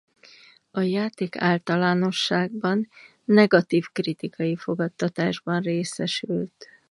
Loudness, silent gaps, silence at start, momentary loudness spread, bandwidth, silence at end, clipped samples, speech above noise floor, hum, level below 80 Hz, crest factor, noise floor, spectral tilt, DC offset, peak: -24 LUFS; none; 0.75 s; 10 LU; 11.5 kHz; 0.25 s; under 0.1%; 29 dB; none; -70 dBFS; 20 dB; -52 dBFS; -6 dB/octave; under 0.1%; -4 dBFS